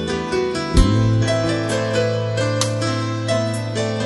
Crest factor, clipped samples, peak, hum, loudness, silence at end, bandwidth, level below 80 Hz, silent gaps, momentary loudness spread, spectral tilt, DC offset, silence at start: 18 dB; under 0.1%; -2 dBFS; none; -20 LUFS; 0 s; 12 kHz; -28 dBFS; none; 5 LU; -5.5 dB/octave; under 0.1%; 0 s